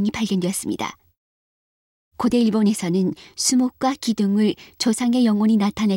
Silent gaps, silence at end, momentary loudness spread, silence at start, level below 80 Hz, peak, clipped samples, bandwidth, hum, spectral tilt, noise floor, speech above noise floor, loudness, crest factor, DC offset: 1.17-2.11 s; 0 s; 7 LU; 0 s; -56 dBFS; -6 dBFS; under 0.1%; 16.5 kHz; none; -5 dB/octave; under -90 dBFS; over 70 dB; -21 LUFS; 14 dB; under 0.1%